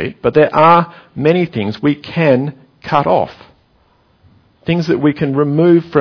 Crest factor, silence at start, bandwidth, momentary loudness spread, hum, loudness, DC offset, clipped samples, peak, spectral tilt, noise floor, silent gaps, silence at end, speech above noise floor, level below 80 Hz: 14 dB; 0 s; 5.4 kHz; 11 LU; none; -13 LUFS; under 0.1%; under 0.1%; 0 dBFS; -8.5 dB/octave; -54 dBFS; none; 0 s; 41 dB; -48 dBFS